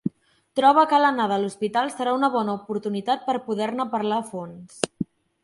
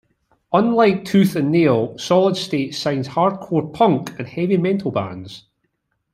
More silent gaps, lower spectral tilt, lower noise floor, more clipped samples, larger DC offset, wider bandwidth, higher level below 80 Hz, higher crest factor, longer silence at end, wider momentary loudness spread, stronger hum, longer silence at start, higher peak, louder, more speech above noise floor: neither; second, -5 dB/octave vs -6.5 dB/octave; second, -44 dBFS vs -71 dBFS; neither; neither; second, 11.5 kHz vs 13.5 kHz; second, -68 dBFS vs -60 dBFS; about the same, 22 dB vs 18 dB; second, 0.4 s vs 0.75 s; first, 16 LU vs 9 LU; neither; second, 0.05 s vs 0.5 s; about the same, -2 dBFS vs 0 dBFS; second, -23 LUFS vs -18 LUFS; second, 22 dB vs 53 dB